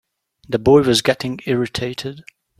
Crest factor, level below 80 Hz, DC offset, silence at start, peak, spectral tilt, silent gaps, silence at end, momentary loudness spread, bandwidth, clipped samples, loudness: 18 dB; -48 dBFS; under 0.1%; 0.5 s; 0 dBFS; -5 dB/octave; none; 0.4 s; 14 LU; 15 kHz; under 0.1%; -17 LUFS